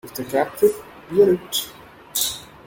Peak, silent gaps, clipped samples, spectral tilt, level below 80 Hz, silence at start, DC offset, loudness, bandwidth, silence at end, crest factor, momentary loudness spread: -4 dBFS; none; under 0.1%; -3.5 dB/octave; -56 dBFS; 0.05 s; under 0.1%; -21 LUFS; 17 kHz; 0.2 s; 18 dB; 10 LU